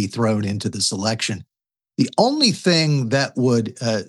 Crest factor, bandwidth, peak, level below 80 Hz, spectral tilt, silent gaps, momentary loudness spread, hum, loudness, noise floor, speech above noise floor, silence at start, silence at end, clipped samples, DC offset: 20 dB; 12 kHz; -2 dBFS; -66 dBFS; -4.5 dB/octave; none; 8 LU; none; -19 LUFS; -89 dBFS; 69 dB; 0 s; 0.05 s; under 0.1%; under 0.1%